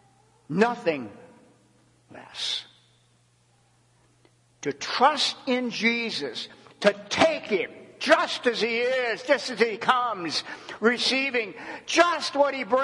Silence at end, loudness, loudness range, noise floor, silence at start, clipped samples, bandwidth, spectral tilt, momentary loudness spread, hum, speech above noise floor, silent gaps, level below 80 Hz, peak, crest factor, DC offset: 0 s; -25 LUFS; 12 LU; -63 dBFS; 0.5 s; under 0.1%; 11.5 kHz; -3 dB/octave; 13 LU; none; 38 dB; none; -74 dBFS; -4 dBFS; 24 dB; under 0.1%